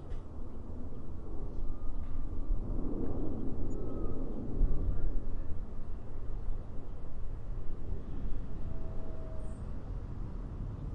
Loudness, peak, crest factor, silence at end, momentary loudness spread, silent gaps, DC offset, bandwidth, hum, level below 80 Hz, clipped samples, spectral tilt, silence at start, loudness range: -42 LUFS; -16 dBFS; 14 dB; 0 s; 8 LU; none; under 0.1%; 2 kHz; none; -36 dBFS; under 0.1%; -9.5 dB/octave; 0 s; 5 LU